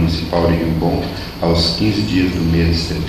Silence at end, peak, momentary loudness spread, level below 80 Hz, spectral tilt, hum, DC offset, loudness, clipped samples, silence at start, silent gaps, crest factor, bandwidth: 0 s; -2 dBFS; 5 LU; -28 dBFS; -6.5 dB/octave; none; under 0.1%; -16 LUFS; under 0.1%; 0 s; none; 14 dB; 14 kHz